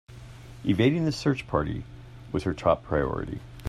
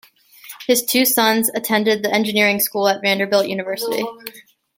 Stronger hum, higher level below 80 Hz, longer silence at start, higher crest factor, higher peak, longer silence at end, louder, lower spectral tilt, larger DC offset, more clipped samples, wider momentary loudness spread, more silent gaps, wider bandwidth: neither; first, -46 dBFS vs -66 dBFS; second, 0.1 s vs 0.45 s; about the same, 20 dB vs 18 dB; second, -8 dBFS vs -2 dBFS; second, 0 s vs 0.35 s; second, -27 LUFS vs -17 LUFS; first, -7 dB/octave vs -2.5 dB/octave; neither; neither; first, 22 LU vs 13 LU; neither; second, 12.5 kHz vs 17 kHz